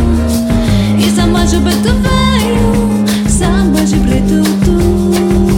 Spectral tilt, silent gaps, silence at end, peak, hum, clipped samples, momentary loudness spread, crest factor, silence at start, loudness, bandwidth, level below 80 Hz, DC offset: -5.5 dB/octave; none; 0 s; 0 dBFS; none; under 0.1%; 2 LU; 10 dB; 0 s; -11 LUFS; 17 kHz; -18 dBFS; under 0.1%